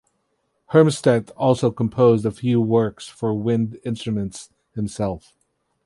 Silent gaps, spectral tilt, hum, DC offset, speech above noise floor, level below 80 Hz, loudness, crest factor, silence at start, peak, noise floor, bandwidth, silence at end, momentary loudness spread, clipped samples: none; -7 dB/octave; none; under 0.1%; 51 dB; -52 dBFS; -21 LUFS; 18 dB; 0.7 s; -2 dBFS; -71 dBFS; 11.5 kHz; 0.7 s; 13 LU; under 0.1%